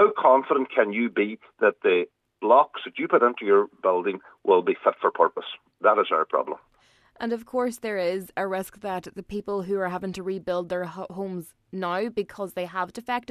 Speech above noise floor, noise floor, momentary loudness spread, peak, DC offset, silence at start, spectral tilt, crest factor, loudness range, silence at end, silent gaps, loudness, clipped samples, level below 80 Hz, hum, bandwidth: 37 dB; -62 dBFS; 14 LU; -4 dBFS; under 0.1%; 0 s; -5.5 dB/octave; 20 dB; 8 LU; 0.1 s; none; -25 LUFS; under 0.1%; -66 dBFS; none; 14 kHz